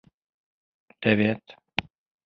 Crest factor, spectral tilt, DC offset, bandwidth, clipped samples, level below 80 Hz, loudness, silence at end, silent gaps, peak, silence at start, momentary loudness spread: 26 dB; -7.5 dB/octave; under 0.1%; 6.4 kHz; under 0.1%; -58 dBFS; -26 LUFS; 0.45 s; none; -2 dBFS; 1 s; 10 LU